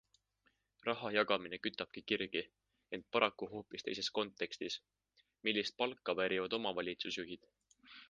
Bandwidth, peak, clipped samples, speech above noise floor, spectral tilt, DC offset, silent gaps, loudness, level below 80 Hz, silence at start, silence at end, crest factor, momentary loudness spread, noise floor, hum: 9.6 kHz; -14 dBFS; under 0.1%; 40 dB; -3.5 dB/octave; under 0.1%; none; -39 LUFS; -76 dBFS; 0.85 s; 0.05 s; 26 dB; 12 LU; -79 dBFS; none